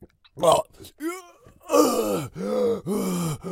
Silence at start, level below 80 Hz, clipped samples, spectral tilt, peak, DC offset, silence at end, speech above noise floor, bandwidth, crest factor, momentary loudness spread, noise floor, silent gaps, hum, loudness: 0 s; -56 dBFS; under 0.1%; -5 dB/octave; -4 dBFS; under 0.1%; 0 s; 25 dB; 16.5 kHz; 20 dB; 13 LU; -49 dBFS; none; none; -24 LUFS